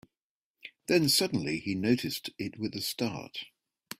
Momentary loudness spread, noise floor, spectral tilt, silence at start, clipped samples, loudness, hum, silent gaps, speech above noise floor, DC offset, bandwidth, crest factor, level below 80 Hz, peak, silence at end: 19 LU; under -90 dBFS; -4 dB/octave; 0.65 s; under 0.1%; -30 LUFS; none; none; over 60 dB; under 0.1%; 16 kHz; 22 dB; -66 dBFS; -10 dBFS; 0.5 s